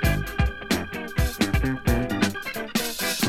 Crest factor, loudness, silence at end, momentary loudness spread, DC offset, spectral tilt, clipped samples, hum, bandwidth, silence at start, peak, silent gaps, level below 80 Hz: 18 dB; -26 LUFS; 0 s; 4 LU; under 0.1%; -4.5 dB/octave; under 0.1%; none; 17.5 kHz; 0 s; -8 dBFS; none; -30 dBFS